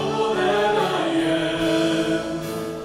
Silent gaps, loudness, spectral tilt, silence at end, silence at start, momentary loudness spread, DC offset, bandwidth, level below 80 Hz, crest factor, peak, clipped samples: none; -22 LUFS; -5 dB/octave; 0 s; 0 s; 7 LU; under 0.1%; 15 kHz; -50 dBFS; 14 dB; -8 dBFS; under 0.1%